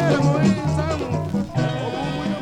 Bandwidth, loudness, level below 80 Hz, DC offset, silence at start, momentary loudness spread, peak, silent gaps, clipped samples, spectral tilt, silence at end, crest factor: 10.5 kHz; -22 LUFS; -42 dBFS; under 0.1%; 0 s; 7 LU; -6 dBFS; none; under 0.1%; -7 dB/octave; 0 s; 14 dB